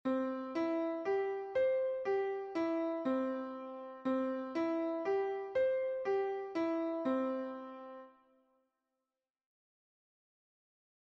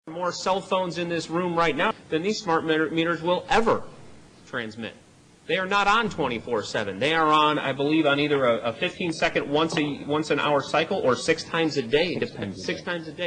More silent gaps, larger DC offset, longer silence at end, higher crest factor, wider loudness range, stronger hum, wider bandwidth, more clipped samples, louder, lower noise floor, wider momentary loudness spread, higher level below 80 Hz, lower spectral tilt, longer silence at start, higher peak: neither; neither; first, 2.95 s vs 0 s; about the same, 14 dB vs 16 dB; first, 7 LU vs 4 LU; neither; second, 7.2 kHz vs 10 kHz; neither; second, -36 LUFS vs -24 LUFS; first, under -90 dBFS vs -48 dBFS; about the same, 10 LU vs 9 LU; second, -80 dBFS vs -54 dBFS; first, -6.5 dB/octave vs -4.5 dB/octave; about the same, 0.05 s vs 0.05 s; second, -24 dBFS vs -8 dBFS